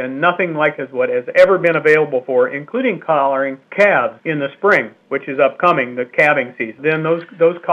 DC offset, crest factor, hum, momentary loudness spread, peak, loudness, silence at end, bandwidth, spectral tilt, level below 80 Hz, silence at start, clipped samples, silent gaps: under 0.1%; 16 dB; none; 8 LU; 0 dBFS; -16 LUFS; 0 s; 8.8 kHz; -6.5 dB/octave; -66 dBFS; 0 s; under 0.1%; none